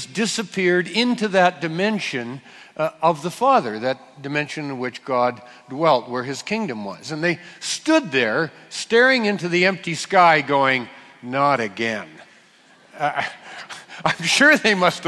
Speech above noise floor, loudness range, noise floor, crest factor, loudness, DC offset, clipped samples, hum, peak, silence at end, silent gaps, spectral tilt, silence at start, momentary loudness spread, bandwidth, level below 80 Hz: 32 dB; 6 LU; -52 dBFS; 20 dB; -20 LUFS; under 0.1%; under 0.1%; none; 0 dBFS; 0 s; none; -4 dB/octave; 0 s; 15 LU; 12 kHz; -68 dBFS